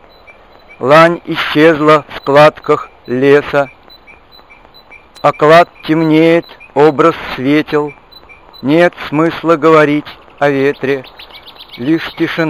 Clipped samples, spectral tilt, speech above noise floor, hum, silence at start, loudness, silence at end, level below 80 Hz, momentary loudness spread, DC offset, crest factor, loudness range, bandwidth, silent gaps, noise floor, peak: 0.8%; -6.5 dB/octave; 31 dB; none; 0.8 s; -11 LUFS; 0 s; -48 dBFS; 13 LU; 0.2%; 12 dB; 3 LU; 13 kHz; none; -41 dBFS; 0 dBFS